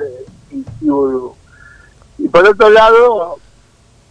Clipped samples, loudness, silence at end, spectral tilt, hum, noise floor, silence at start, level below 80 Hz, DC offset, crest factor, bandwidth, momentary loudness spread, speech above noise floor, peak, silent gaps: under 0.1%; -10 LUFS; 0.75 s; -5.5 dB/octave; none; -48 dBFS; 0 s; -42 dBFS; under 0.1%; 12 dB; 9.6 kHz; 23 LU; 39 dB; 0 dBFS; none